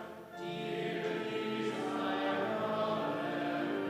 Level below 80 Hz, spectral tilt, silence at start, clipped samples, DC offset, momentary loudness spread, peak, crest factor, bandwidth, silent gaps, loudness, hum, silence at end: -80 dBFS; -6 dB/octave; 0 s; under 0.1%; under 0.1%; 6 LU; -22 dBFS; 14 dB; 15.5 kHz; none; -36 LUFS; none; 0 s